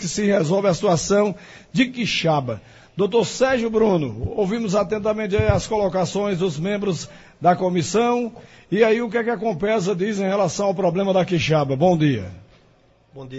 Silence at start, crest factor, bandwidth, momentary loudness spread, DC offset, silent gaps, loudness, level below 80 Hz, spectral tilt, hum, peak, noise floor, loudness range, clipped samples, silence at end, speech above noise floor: 0 s; 16 dB; 8 kHz; 8 LU; under 0.1%; none; -20 LUFS; -44 dBFS; -5.5 dB/octave; none; -4 dBFS; -56 dBFS; 1 LU; under 0.1%; 0 s; 36 dB